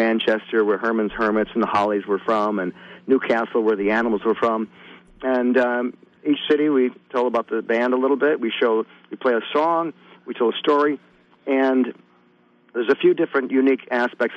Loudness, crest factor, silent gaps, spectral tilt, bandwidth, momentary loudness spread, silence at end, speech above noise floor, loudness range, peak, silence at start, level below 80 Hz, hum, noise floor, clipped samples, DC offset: -21 LUFS; 14 dB; none; -6.5 dB/octave; 7.6 kHz; 8 LU; 0 s; 37 dB; 1 LU; -8 dBFS; 0 s; -60 dBFS; none; -57 dBFS; under 0.1%; under 0.1%